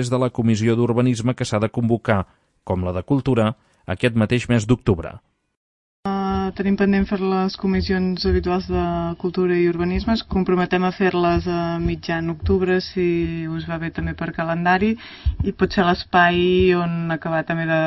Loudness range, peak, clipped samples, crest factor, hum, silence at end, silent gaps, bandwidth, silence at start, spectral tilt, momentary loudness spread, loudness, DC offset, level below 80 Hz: 3 LU; -2 dBFS; under 0.1%; 18 dB; none; 0 s; 5.57-6.03 s; 10.5 kHz; 0 s; -7 dB/octave; 8 LU; -20 LUFS; under 0.1%; -36 dBFS